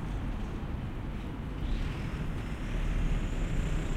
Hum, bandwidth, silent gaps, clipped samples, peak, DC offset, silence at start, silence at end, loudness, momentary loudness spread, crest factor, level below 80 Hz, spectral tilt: none; 10 kHz; none; under 0.1%; -20 dBFS; under 0.1%; 0 s; 0 s; -36 LUFS; 5 LU; 14 dB; -34 dBFS; -6.5 dB/octave